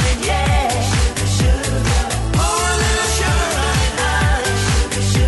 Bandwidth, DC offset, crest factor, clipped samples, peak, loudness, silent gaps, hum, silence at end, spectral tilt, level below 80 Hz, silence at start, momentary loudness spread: 12 kHz; under 0.1%; 12 dB; under 0.1%; -4 dBFS; -17 LUFS; none; none; 0 s; -4 dB/octave; -20 dBFS; 0 s; 2 LU